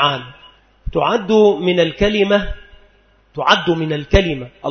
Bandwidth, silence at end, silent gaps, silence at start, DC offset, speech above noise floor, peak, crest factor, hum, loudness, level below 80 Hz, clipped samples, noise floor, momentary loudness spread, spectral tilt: 6.6 kHz; 0 s; none; 0 s; under 0.1%; 37 dB; 0 dBFS; 16 dB; none; -16 LUFS; -30 dBFS; under 0.1%; -53 dBFS; 15 LU; -5.5 dB/octave